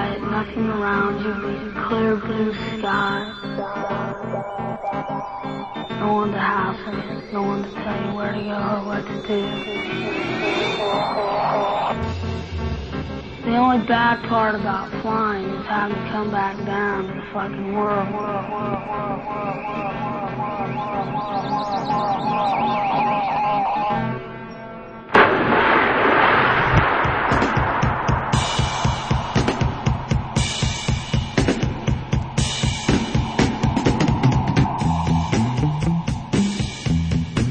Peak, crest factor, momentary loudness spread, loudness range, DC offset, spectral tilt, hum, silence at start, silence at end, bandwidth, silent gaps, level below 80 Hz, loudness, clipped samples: 0 dBFS; 20 dB; 10 LU; 8 LU; under 0.1%; -5.5 dB/octave; none; 0 s; 0 s; 9.8 kHz; none; -36 dBFS; -21 LUFS; under 0.1%